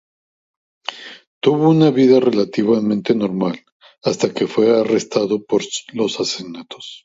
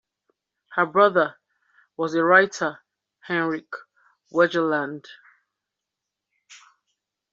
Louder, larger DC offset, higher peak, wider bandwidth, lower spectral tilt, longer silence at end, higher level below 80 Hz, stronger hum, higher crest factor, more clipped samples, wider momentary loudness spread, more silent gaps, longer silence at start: first, -17 LUFS vs -22 LUFS; neither; first, 0 dBFS vs -4 dBFS; about the same, 8 kHz vs 7.8 kHz; first, -5.5 dB/octave vs -3 dB/octave; second, 0.05 s vs 0.75 s; first, -62 dBFS vs -76 dBFS; neither; about the same, 18 dB vs 22 dB; neither; about the same, 18 LU vs 18 LU; first, 1.27-1.41 s, 3.72-3.80 s vs none; first, 0.9 s vs 0.7 s